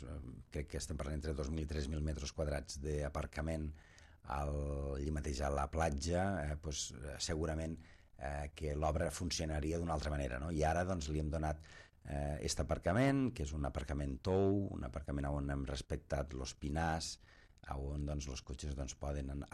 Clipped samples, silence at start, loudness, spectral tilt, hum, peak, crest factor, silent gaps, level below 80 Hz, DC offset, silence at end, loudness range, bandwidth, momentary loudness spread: under 0.1%; 0 s; -40 LUFS; -5.5 dB/octave; none; -20 dBFS; 20 dB; none; -46 dBFS; under 0.1%; 0.05 s; 4 LU; 13 kHz; 10 LU